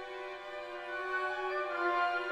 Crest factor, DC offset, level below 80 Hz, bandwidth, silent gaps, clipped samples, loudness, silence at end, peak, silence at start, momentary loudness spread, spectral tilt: 16 dB; under 0.1%; -72 dBFS; 11.5 kHz; none; under 0.1%; -36 LUFS; 0 s; -20 dBFS; 0 s; 11 LU; -3 dB/octave